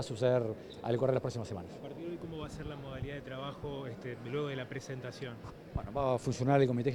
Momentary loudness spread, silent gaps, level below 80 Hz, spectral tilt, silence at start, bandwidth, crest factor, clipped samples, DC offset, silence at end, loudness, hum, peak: 13 LU; none; -56 dBFS; -7 dB/octave; 0 s; 12 kHz; 20 dB; under 0.1%; under 0.1%; 0 s; -36 LUFS; none; -16 dBFS